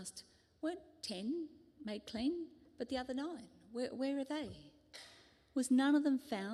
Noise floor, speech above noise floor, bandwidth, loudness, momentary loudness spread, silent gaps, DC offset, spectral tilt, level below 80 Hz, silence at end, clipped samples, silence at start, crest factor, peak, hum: -64 dBFS; 26 dB; 13 kHz; -39 LUFS; 22 LU; none; under 0.1%; -4 dB/octave; -72 dBFS; 0 s; under 0.1%; 0 s; 16 dB; -24 dBFS; none